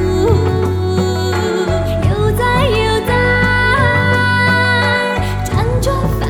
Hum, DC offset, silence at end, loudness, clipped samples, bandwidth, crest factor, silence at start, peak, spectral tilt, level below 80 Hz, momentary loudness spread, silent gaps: none; under 0.1%; 0 s; -14 LUFS; under 0.1%; 16.5 kHz; 12 dB; 0 s; -2 dBFS; -6 dB/octave; -26 dBFS; 5 LU; none